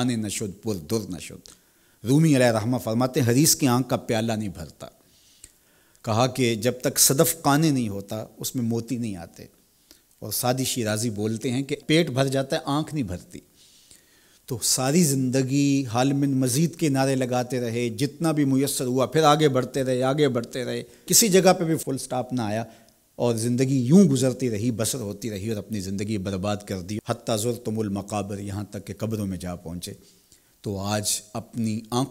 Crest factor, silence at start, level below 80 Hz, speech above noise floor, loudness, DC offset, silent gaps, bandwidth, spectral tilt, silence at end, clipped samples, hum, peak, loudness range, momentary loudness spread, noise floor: 20 dB; 0 s; -58 dBFS; 36 dB; -23 LUFS; under 0.1%; none; 16 kHz; -4.5 dB/octave; 0 s; under 0.1%; none; -4 dBFS; 7 LU; 15 LU; -59 dBFS